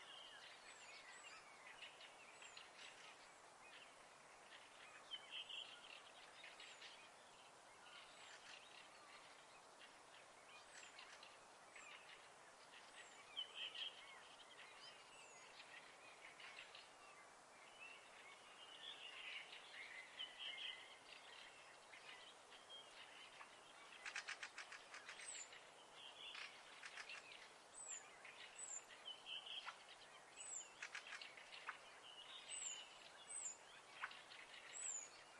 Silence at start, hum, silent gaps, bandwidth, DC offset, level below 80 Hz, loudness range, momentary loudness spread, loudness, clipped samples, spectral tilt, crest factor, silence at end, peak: 0 s; none; none; 12 kHz; under 0.1%; under -90 dBFS; 7 LU; 12 LU; -56 LUFS; under 0.1%; 1 dB/octave; 24 dB; 0 s; -36 dBFS